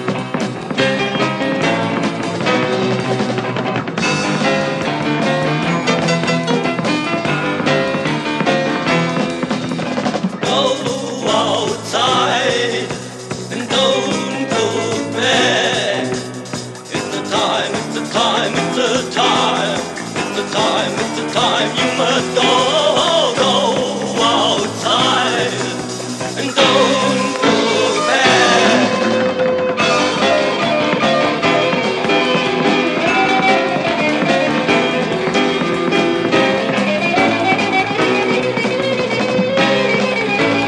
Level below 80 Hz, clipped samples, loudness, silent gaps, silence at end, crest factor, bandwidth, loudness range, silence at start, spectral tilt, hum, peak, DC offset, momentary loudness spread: -52 dBFS; under 0.1%; -15 LUFS; none; 0 s; 16 dB; 12 kHz; 4 LU; 0 s; -4 dB/octave; none; 0 dBFS; under 0.1%; 7 LU